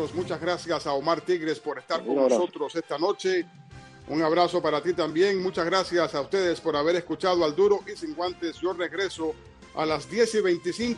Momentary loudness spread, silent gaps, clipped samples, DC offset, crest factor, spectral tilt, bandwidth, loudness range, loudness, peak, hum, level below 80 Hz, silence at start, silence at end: 8 LU; none; under 0.1%; under 0.1%; 18 dB; -4.5 dB/octave; 11.5 kHz; 2 LU; -26 LUFS; -8 dBFS; none; -60 dBFS; 0 s; 0 s